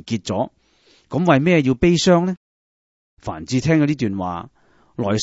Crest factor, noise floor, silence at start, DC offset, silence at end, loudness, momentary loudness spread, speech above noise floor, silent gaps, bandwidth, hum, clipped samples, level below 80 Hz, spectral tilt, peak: 20 dB; -57 dBFS; 0.05 s; under 0.1%; 0 s; -19 LUFS; 17 LU; 39 dB; 2.37-3.17 s; 8 kHz; none; under 0.1%; -46 dBFS; -6 dB/octave; 0 dBFS